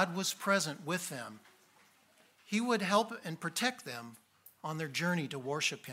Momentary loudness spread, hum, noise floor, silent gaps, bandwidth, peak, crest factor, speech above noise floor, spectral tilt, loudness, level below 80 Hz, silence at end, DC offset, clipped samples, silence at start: 14 LU; none; -67 dBFS; none; 16 kHz; -14 dBFS; 22 dB; 32 dB; -3.5 dB/octave; -34 LUFS; -82 dBFS; 0 s; under 0.1%; under 0.1%; 0 s